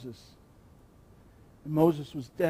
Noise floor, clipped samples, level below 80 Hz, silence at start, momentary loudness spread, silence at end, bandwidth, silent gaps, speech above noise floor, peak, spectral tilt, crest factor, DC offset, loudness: -57 dBFS; under 0.1%; -62 dBFS; 0 s; 22 LU; 0 s; 15.5 kHz; none; 28 dB; -10 dBFS; -8 dB/octave; 22 dB; under 0.1%; -28 LUFS